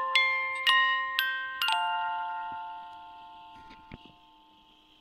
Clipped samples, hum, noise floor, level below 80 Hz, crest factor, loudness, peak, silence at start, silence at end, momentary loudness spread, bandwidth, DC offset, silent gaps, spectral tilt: under 0.1%; none; -60 dBFS; -68 dBFS; 24 dB; -27 LUFS; -6 dBFS; 0 s; 0.95 s; 25 LU; 16 kHz; under 0.1%; none; 0 dB/octave